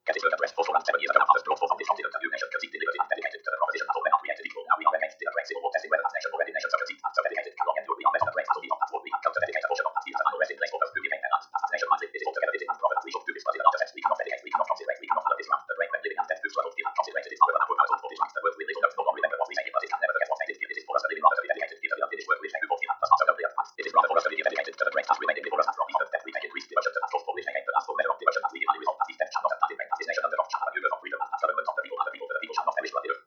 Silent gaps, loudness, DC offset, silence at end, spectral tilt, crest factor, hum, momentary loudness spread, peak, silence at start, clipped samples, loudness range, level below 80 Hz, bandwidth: none; -28 LUFS; under 0.1%; 0.05 s; -1.5 dB/octave; 24 dB; none; 7 LU; -2 dBFS; 0.05 s; under 0.1%; 3 LU; -90 dBFS; 7.2 kHz